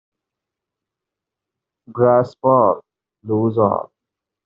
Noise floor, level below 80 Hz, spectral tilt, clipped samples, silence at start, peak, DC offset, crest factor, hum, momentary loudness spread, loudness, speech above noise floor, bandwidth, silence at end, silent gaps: -85 dBFS; -62 dBFS; -9 dB/octave; under 0.1%; 1.9 s; -2 dBFS; under 0.1%; 20 dB; none; 12 LU; -17 LUFS; 69 dB; 5.6 kHz; 0.6 s; none